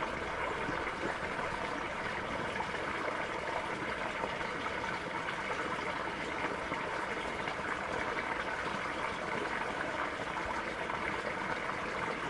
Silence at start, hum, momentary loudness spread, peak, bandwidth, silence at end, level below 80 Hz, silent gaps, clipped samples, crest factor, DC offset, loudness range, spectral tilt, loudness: 0 s; none; 1 LU; -18 dBFS; 11.5 kHz; 0 s; -58 dBFS; none; under 0.1%; 18 dB; under 0.1%; 0 LU; -4 dB/octave; -36 LUFS